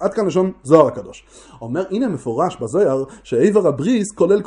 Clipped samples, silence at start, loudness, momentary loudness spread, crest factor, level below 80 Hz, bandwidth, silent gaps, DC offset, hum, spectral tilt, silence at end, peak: under 0.1%; 0 s; -18 LUFS; 12 LU; 18 dB; -54 dBFS; 11 kHz; none; under 0.1%; none; -7 dB/octave; 0 s; 0 dBFS